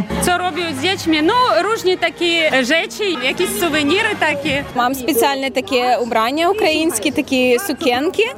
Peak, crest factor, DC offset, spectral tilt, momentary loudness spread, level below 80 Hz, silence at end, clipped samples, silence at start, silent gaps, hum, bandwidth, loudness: -2 dBFS; 14 dB; under 0.1%; -3 dB/octave; 4 LU; -46 dBFS; 0 s; under 0.1%; 0 s; none; none; 16.5 kHz; -16 LUFS